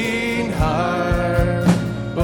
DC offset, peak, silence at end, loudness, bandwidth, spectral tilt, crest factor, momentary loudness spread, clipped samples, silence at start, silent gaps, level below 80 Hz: under 0.1%; -4 dBFS; 0 s; -19 LUFS; 18 kHz; -6.5 dB/octave; 16 dB; 4 LU; under 0.1%; 0 s; none; -30 dBFS